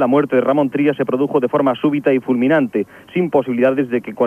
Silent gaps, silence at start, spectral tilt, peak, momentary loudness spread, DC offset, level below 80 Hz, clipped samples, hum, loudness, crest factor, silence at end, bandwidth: none; 0 s; -8.5 dB/octave; -2 dBFS; 6 LU; under 0.1%; -64 dBFS; under 0.1%; none; -17 LUFS; 14 dB; 0 s; 12.5 kHz